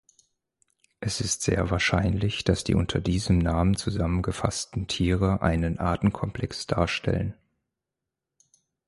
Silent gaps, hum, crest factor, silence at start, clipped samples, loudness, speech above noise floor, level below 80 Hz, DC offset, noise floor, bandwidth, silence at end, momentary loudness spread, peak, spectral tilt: none; none; 20 dB; 1 s; under 0.1%; -26 LUFS; 61 dB; -38 dBFS; under 0.1%; -87 dBFS; 11.5 kHz; 1.55 s; 7 LU; -8 dBFS; -5.5 dB/octave